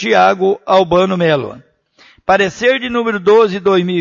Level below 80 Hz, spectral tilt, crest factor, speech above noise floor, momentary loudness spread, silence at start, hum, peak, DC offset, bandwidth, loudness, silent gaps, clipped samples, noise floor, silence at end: -48 dBFS; -5.5 dB/octave; 14 dB; 36 dB; 6 LU; 0 s; none; 0 dBFS; under 0.1%; 7.4 kHz; -13 LUFS; none; under 0.1%; -48 dBFS; 0 s